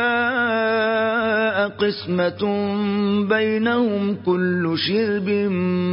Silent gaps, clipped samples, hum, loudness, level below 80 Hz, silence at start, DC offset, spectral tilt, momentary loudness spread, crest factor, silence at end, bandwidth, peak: none; under 0.1%; none; -20 LUFS; -56 dBFS; 0 s; under 0.1%; -10.5 dB/octave; 3 LU; 12 dB; 0 s; 5.6 kHz; -6 dBFS